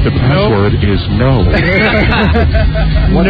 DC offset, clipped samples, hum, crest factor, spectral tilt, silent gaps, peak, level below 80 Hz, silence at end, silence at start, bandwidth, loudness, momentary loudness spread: under 0.1%; under 0.1%; none; 8 dB; -9 dB/octave; none; 0 dBFS; -16 dBFS; 0 s; 0 s; 5 kHz; -11 LUFS; 3 LU